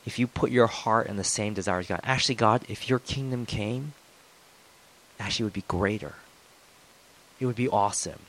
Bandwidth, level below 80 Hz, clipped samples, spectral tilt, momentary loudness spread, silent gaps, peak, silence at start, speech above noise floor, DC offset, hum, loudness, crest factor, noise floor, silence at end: 15.5 kHz; -54 dBFS; under 0.1%; -4.5 dB/octave; 9 LU; none; -6 dBFS; 0.05 s; 29 dB; under 0.1%; none; -27 LUFS; 22 dB; -56 dBFS; 0.1 s